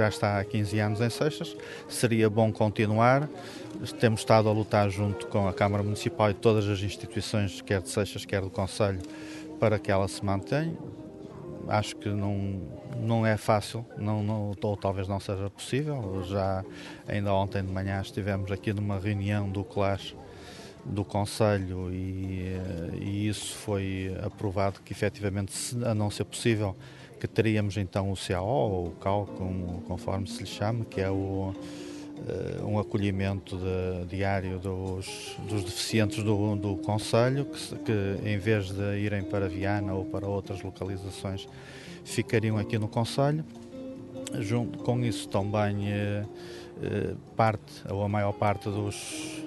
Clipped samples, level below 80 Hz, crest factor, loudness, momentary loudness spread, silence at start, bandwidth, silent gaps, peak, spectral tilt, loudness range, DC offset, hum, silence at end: under 0.1%; -56 dBFS; 22 dB; -30 LUFS; 12 LU; 0 s; 12 kHz; none; -6 dBFS; -6 dB/octave; 5 LU; under 0.1%; none; 0 s